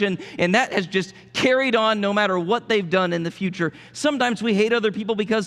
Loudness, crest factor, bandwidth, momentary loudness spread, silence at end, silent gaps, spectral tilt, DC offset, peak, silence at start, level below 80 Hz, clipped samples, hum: -21 LUFS; 16 dB; 12.5 kHz; 7 LU; 0 s; none; -5 dB/octave; under 0.1%; -4 dBFS; 0 s; -64 dBFS; under 0.1%; none